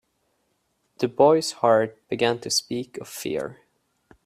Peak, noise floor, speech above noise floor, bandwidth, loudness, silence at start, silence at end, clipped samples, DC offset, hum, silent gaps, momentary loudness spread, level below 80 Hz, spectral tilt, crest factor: -4 dBFS; -72 dBFS; 49 dB; 15.5 kHz; -23 LUFS; 1 s; 0.75 s; under 0.1%; under 0.1%; none; none; 14 LU; -66 dBFS; -3.5 dB/octave; 20 dB